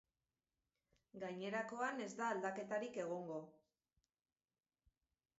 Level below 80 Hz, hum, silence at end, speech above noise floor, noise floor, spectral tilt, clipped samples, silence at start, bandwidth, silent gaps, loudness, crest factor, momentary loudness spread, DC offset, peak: -88 dBFS; none; 1.9 s; over 45 dB; under -90 dBFS; -4 dB/octave; under 0.1%; 1.15 s; 7.6 kHz; none; -45 LUFS; 20 dB; 10 LU; under 0.1%; -28 dBFS